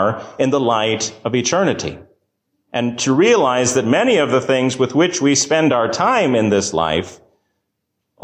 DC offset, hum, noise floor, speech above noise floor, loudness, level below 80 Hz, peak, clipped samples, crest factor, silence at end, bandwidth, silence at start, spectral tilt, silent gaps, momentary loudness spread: under 0.1%; none; -74 dBFS; 58 dB; -16 LUFS; -50 dBFS; -4 dBFS; under 0.1%; 14 dB; 1.1 s; 15.5 kHz; 0 s; -4 dB/octave; none; 7 LU